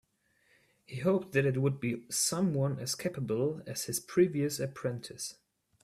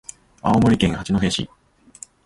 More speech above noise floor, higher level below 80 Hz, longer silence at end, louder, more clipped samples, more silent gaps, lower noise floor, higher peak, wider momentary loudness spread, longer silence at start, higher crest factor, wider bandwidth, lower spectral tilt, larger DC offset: first, 40 dB vs 26 dB; second, -70 dBFS vs -40 dBFS; second, 0.5 s vs 0.8 s; second, -32 LUFS vs -20 LUFS; neither; neither; first, -72 dBFS vs -45 dBFS; second, -14 dBFS vs -4 dBFS; second, 10 LU vs 24 LU; first, 0.9 s vs 0.45 s; about the same, 18 dB vs 18 dB; first, 16 kHz vs 11.5 kHz; about the same, -5 dB/octave vs -5.5 dB/octave; neither